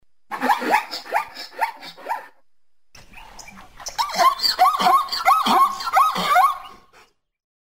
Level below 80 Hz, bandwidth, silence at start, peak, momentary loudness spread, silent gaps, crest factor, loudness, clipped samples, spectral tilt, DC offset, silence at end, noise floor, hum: -56 dBFS; 16 kHz; 0.3 s; -4 dBFS; 16 LU; none; 18 dB; -19 LUFS; under 0.1%; -2 dB/octave; 0.3%; 1.05 s; -78 dBFS; none